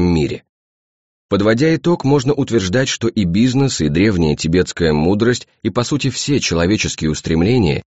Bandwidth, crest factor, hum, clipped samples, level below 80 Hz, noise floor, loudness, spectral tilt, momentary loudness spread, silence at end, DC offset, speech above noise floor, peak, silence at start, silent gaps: 8.2 kHz; 14 dB; none; under 0.1%; -36 dBFS; under -90 dBFS; -16 LUFS; -5.5 dB/octave; 4 LU; 0.05 s; 0.3%; over 75 dB; -2 dBFS; 0 s; 0.49-1.29 s